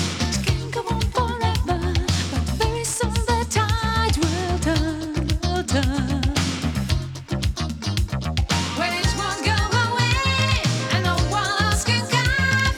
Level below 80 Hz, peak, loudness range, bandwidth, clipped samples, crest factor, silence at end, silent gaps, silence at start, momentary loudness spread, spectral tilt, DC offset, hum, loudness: -30 dBFS; -6 dBFS; 4 LU; 17 kHz; under 0.1%; 16 dB; 0 s; none; 0 s; 6 LU; -4.5 dB/octave; under 0.1%; none; -22 LUFS